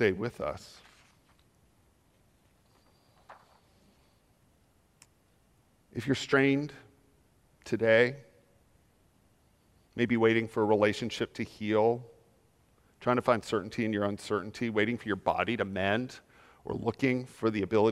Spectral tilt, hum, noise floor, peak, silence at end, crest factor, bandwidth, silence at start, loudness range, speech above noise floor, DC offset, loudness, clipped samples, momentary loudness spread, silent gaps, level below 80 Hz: -6 dB/octave; none; -67 dBFS; -10 dBFS; 0 s; 22 dB; 13.5 kHz; 0 s; 4 LU; 38 dB; under 0.1%; -30 LUFS; under 0.1%; 15 LU; none; -66 dBFS